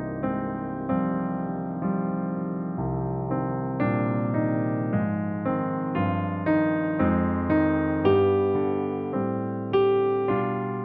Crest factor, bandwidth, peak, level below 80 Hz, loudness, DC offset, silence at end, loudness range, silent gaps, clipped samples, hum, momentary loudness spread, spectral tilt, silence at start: 16 dB; 4.7 kHz; -8 dBFS; -50 dBFS; -26 LUFS; under 0.1%; 0 s; 5 LU; none; under 0.1%; none; 7 LU; -7.5 dB/octave; 0 s